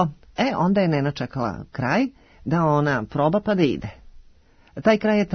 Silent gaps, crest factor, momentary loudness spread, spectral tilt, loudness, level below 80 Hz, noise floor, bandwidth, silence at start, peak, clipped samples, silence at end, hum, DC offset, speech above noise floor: none; 18 dB; 9 LU; -7.5 dB/octave; -22 LUFS; -50 dBFS; -53 dBFS; 6.6 kHz; 0 s; -4 dBFS; under 0.1%; 0 s; none; under 0.1%; 31 dB